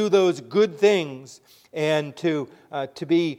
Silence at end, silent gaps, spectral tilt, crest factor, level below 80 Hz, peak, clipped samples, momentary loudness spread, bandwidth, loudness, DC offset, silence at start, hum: 0 s; none; -5.5 dB/octave; 16 dB; -74 dBFS; -6 dBFS; under 0.1%; 14 LU; 13 kHz; -23 LUFS; under 0.1%; 0 s; none